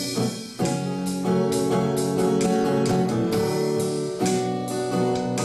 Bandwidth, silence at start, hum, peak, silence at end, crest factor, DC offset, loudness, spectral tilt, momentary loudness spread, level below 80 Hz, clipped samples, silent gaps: 14.5 kHz; 0 s; none; -10 dBFS; 0 s; 12 dB; under 0.1%; -24 LUFS; -5.5 dB/octave; 5 LU; -56 dBFS; under 0.1%; none